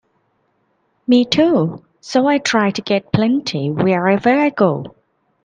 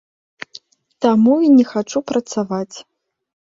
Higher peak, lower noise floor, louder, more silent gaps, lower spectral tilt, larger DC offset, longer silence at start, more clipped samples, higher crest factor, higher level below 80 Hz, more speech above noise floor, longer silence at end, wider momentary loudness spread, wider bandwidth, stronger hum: about the same, 0 dBFS vs -2 dBFS; first, -64 dBFS vs -44 dBFS; about the same, -16 LUFS vs -16 LUFS; neither; about the same, -6 dB/octave vs -6 dB/octave; neither; about the same, 1.1 s vs 1 s; neither; about the same, 16 dB vs 16 dB; first, -56 dBFS vs -62 dBFS; first, 49 dB vs 29 dB; second, 0.55 s vs 0.7 s; second, 9 LU vs 23 LU; first, 9.6 kHz vs 7.8 kHz; neither